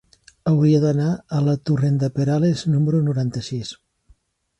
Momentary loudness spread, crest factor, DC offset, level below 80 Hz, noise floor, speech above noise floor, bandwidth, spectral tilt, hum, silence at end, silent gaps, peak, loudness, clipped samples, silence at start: 11 LU; 14 dB; under 0.1%; -54 dBFS; -57 dBFS; 38 dB; 8.6 kHz; -8 dB/octave; none; 0.85 s; none; -6 dBFS; -20 LUFS; under 0.1%; 0.45 s